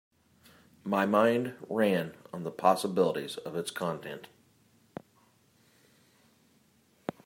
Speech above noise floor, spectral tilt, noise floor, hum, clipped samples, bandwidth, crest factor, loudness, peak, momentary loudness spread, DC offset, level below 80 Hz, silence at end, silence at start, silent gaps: 37 dB; -5.5 dB/octave; -66 dBFS; none; under 0.1%; 16 kHz; 24 dB; -30 LUFS; -10 dBFS; 20 LU; under 0.1%; -78 dBFS; 3 s; 0.85 s; none